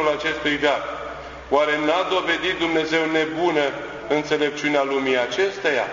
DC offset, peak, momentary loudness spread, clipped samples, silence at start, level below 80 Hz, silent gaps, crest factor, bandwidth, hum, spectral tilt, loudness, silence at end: under 0.1%; -4 dBFS; 5 LU; under 0.1%; 0 s; -52 dBFS; none; 18 dB; 7.6 kHz; none; -4 dB/octave; -21 LUFS; 0 s